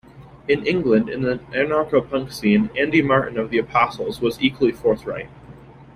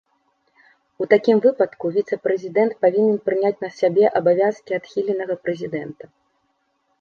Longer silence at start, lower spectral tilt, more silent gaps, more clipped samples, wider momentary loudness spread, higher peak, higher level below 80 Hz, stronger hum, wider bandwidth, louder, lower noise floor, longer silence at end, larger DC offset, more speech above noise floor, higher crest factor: second, 0.15 s vs 1 s; about the same, -6.5 dB/octave vs -7.5 dB/octave; neither; neither; second, 7 LU vs 10 LU; about the same, -2 dBFS vs -2 dBFS; first, -50 dBFS vs -70 dBFS; neither; first, 15 kHz vs 6.8 kHz; about the same, -20 LUFS vs -20 LUFS; second, -43 dBFS vs -69 dBFS; second, 0.1 s vs 1.1 s; neither; second, 23 dB vs 49 dB; about the same, 18 dB vs 18 dB